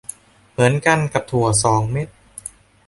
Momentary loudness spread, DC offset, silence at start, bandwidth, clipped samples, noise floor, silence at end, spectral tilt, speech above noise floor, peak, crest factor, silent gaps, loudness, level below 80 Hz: 19 LU; under 0.1%; 0.6 s; 12 kHz; under 0.1%; -39 dBFS; 0.4 s; -4.5 dB/octave; 22 dB; 0 dBFS; 18 dB; none; -18 LUFS; -46 dBFS